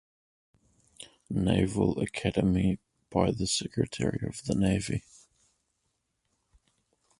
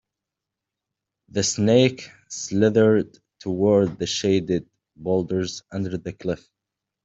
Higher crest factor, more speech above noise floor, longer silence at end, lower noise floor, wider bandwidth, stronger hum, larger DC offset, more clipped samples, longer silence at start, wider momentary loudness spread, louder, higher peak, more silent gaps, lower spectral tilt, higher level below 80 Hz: about the same, 22 dB vs 20 dB; second, 51 dB vs 64 dB; first, 2.2 s vs 0.7 s; second, -79 dBFS vs -86 dBFS; first, 11.5 kHz vs 8.2 kHz; neither; neither; neither; second, 1 s vs 1.35 s; second, 10 LU vs 16 LU; second, -29 LUFS vs -22 LUFS; second, -8 dBFS vs -4 dBFS; neither; about the same, -5.5 dB/octave vs -5 dB/octave; first, -48 dBFS vs -58 dBFS